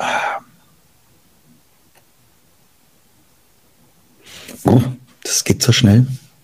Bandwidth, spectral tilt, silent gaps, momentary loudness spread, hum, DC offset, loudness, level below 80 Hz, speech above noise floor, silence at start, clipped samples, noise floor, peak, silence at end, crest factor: 16 kHz; -4.5 dB/octave; none; 21 LU; none; 0.1%; -16 LUFS; -50 dBFS; 43 dB; 0 s; under 0.1%; -56 dBFS; 0 dBFS; 0.25 s; 20 dB